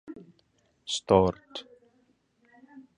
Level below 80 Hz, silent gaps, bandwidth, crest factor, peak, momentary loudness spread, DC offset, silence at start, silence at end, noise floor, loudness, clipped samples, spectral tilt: -54 dBFS; none; 10.5 kHz; 24 dB; -6 dBFS; 24 LU; under 0.1%; 0.05 s; 0.2 s; -69 dBFS; -25 LUFS; under 0.1%; -5 dB/octave